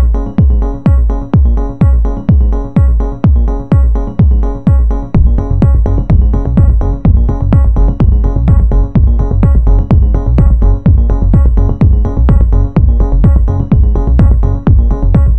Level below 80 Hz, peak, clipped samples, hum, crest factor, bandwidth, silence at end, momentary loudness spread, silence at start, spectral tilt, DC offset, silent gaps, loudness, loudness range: -10 dBFS; 0 dBFS; under 0.1%; none; 8 dB; 3 kHz; 0 s; 2 LU; 0 s; -11 dB/octave; 3%; none; -11 LUFS; 1 LU